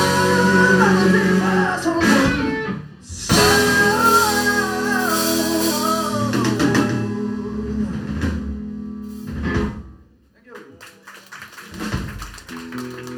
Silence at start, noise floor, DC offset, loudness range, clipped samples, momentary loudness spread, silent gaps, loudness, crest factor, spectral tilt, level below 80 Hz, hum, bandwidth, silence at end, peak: 0 s; -51 dBFS; under 0.1%; 14 LU; under 0.1%; 18 LU; none; -18 LUFS; 18 dB; -4.5 dB/octave; -38 dBFS; none; over 20 kHz; 0 s; -2 dBFS